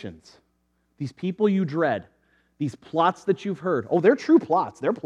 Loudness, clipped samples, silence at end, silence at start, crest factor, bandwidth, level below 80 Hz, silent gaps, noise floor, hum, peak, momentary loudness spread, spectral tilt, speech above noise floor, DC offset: -23 LUFS; under 0.1%; 0.05 s; 0.05 s; 20 dB; 9 kHz; -70 dBFS; none; -70 dBFS; none; -4 dBFS; 12 LU; -7.5 dB/octave; 47 dB; under 0.1%